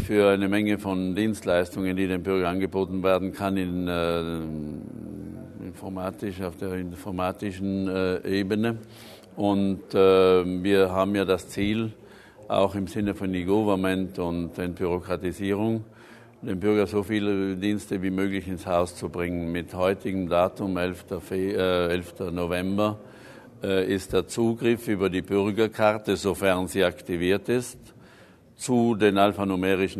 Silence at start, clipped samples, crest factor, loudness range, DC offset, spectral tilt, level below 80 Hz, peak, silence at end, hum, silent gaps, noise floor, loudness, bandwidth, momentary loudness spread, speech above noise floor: 0 s; under 0.1%; 20 dB; 6 LU; under 0.1%; -6 dB/octave; -56 dBFS; -4 dBFS; 0 s; none; none; -52 dBFS; -26 LUFS; 13.5 kHz; 11 LU; 28 dB